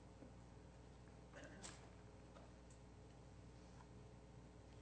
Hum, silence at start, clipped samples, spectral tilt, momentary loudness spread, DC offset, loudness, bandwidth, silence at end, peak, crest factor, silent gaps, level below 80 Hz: 60 Hz at -65 dBFS; 0 s; under 0.1%; -5 dB/octave; 6 LU; under 0.1%; -62 LUFS; 9 kHz; 0 s; -40 dBFS; 20 dB; none; -68 dBFS